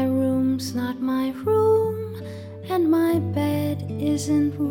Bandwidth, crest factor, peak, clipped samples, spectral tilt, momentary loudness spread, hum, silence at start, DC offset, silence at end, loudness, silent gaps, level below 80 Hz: 18.5 kHz; 12 dB; -10 dBFS; under 0.1%; -7 dB/octave; 10 LU; none; 0 s; under 0.1%; 0 s; -23 LUFS; none; -60 dBFS